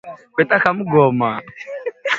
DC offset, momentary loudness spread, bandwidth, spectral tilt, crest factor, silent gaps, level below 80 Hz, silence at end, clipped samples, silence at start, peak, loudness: under 0.1%; 14 LU; 7.6 kHz; -7 dB/octave; 18 dB; none; -60 dBFS; 0 s; under 0.1%; 0.05 s; 0 dBFS; -17 LUFS